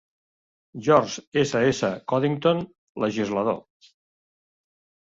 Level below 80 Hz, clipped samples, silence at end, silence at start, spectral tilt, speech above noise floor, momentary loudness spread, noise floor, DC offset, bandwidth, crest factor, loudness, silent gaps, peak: -62 dBFS; under 0.1%; 1.45 s; 0.75 s; -5.5 dB/octave; over 67 dB; 9 LU; under -90 dBFS; under 0.1%; 7.8 kHz; 22 dB; -24 LUFS; 1.27-1.32 s, 2.78-2.95 s; -4 dBFS